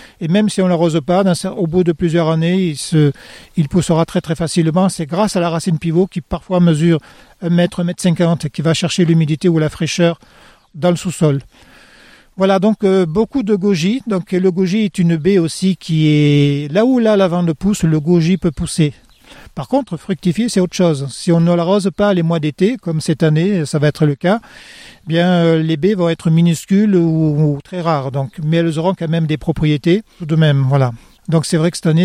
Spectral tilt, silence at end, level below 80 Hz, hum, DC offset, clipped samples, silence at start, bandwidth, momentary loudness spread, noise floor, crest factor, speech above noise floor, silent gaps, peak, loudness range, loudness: -6.5 dB/octave; 0 s; -44 dBFS; none; under 0.1%; under 0.1%; 0 s; 12.5 kHz; 6 LU; -45 dBFS; 12 dB; 30 dB; none; -2 dBFS; 3 LU; -15 LUFS